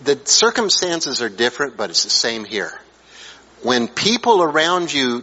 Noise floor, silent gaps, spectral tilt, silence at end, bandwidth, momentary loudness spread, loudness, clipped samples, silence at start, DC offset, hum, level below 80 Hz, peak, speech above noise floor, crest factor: -42 dBFS; none; -1.5 dB/octave; 0 s; 8.2 kHz; 10 LU; -17 LUFS; under 0.1%; 0 s; under 0.1%; none; -60 dBFS; -2 dBFS; 24 dB; 18 dB